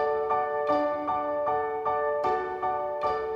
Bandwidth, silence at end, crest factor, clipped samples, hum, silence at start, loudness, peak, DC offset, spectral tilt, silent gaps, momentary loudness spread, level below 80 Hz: 7.2 kHz; 0 s; 14 dB; under 0.1%; none; 0 s; -28 LUFS; -14 dBFS; under 0.1%; -6.5 dB/octave; none; 3 LU; -60 dBFS